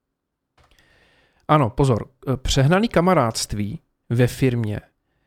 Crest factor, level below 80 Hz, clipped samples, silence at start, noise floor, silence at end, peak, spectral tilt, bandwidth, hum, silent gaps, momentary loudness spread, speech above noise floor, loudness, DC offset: 20 dB; -38 dBFS; under 0.1%; 1.5 s; -79 dBFS; 0.45 s; -2 dBFS; -6 dB/octave; 15.5 kHz; none; none; 12 LU; 59 dB; -20 LUFS; under 0.1%